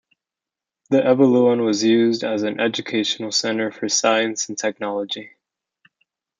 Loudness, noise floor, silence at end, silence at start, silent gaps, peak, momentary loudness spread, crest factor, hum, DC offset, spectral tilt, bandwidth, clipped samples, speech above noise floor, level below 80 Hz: -19 LUFS; -88 dBFS; 1.1 s; 0.9 s; none; -2 dBFS; 10 LU; 18 dB; none; under 0.1%; -3.5 dB/octave; 9.4 kHz; under 0.1%; 69 dB; -70 dBFS